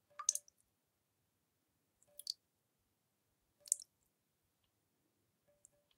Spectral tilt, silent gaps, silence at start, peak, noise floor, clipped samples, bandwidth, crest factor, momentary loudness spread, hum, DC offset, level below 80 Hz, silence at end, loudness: 3.5 dB/octave; none; 0.2 s; -10 dBFS; -84 dBFS; under 0.1%; 16 kHz; 40 dB; 22 LU; none; under 0.1%; under -90 dBFS; 2.15 s; -41 LUFS